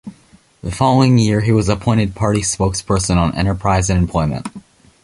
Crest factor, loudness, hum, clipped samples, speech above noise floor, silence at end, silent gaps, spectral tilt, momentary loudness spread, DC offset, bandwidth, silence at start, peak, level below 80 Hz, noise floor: 14 dB; -16 LUFS; none; under 0.1%; 35 dB; 0.45 s; none; -5.5 dB/octave; 9 LU; under 0.1%; 11.5 kHz; 0.05 s; -2 dBFS; -30 dBFS; -50 dBFS